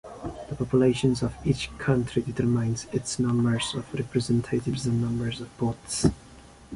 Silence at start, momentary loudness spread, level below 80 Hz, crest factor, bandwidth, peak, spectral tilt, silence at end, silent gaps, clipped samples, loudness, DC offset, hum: 0.05 s; 9 LU; -46 dBFS; 18 dB; 11.5 kHz; -8 dBFS; -6 dB/octave; 0 s; none; under 0.1%; -27 LUFS; under 0.1%; none